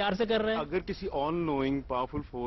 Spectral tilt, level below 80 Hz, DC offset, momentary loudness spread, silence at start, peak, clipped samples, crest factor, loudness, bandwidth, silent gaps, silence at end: -7.5 dB/octave; -48 dBFS; under 0.1%; 6 LU; 0 s; -18 dBFS; under 0.1%; 12 dB; -31 LUFS; 6.2 kHz; none; 0 s